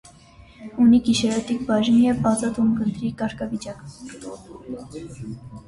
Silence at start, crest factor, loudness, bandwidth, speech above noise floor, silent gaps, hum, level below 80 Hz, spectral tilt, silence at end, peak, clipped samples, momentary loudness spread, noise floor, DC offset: 0.6 s; 16 dB; -21 LUFS; 11.5 kHz; 26 dB; none; none; -50 dBFS; -5.5 dB/octave; 0.1 s; -8 dBFS; under 0.1%; 21 LU; -48 dBFS; under 0.1%